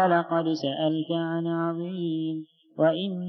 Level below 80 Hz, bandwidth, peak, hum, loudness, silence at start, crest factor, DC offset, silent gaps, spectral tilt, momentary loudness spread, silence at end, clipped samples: under -90 dBFS; 6.2 kHz; -10 dBFS; none; -27 LUFS; 0 s; 16 dB; under 0.1%; none; -7.5 dB/octave; 7 LU; 0 s; under 0.1%